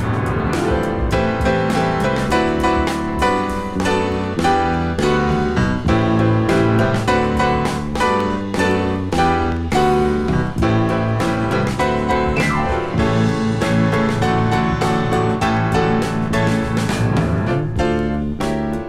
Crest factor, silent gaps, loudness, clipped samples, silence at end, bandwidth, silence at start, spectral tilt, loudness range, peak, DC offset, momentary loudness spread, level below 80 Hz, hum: 14 dB; none; -18 LUFS; under 0.1%; 0 s; 14 kHz; 0 s; -6.5 dB/octave; 1 LU; -2 dBFS; under 0.1%; 4 LU; -30 dBFS; none